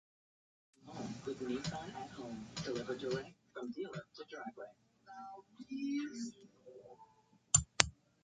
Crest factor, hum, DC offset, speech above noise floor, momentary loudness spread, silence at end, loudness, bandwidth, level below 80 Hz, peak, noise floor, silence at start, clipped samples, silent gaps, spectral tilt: 42 dB; none; under 0.1%; 26 dB; 23 LU; 0.3 s; -39 LUFS; 9.4 kHz; -62 dBFS; -2 dBFS; -69 dBFS; 0.8 s; under 0.1%; none; -2.5 dB/octave